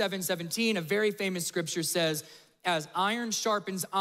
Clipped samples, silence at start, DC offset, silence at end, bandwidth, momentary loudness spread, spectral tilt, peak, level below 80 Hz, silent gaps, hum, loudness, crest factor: under 0.1%; 0 s; under 0.1%; 0 s; 16 kHz; 4 LU; -3 dB/octave; -16 dBFS; -78 dBFS; none; none; -30 LUFS; 16 dB